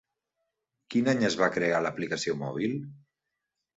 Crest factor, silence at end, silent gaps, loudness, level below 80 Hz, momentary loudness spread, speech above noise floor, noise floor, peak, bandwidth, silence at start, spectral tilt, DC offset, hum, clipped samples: 20 dB; 0.8 s; none; -28 LUFS; -68 dBFS; 7 LU; 57 dB; -85 dBFS; -10 dBFS; 8 kHz; 0.9 s; -5 dB/octave; under 0.1%; none; under 0.1%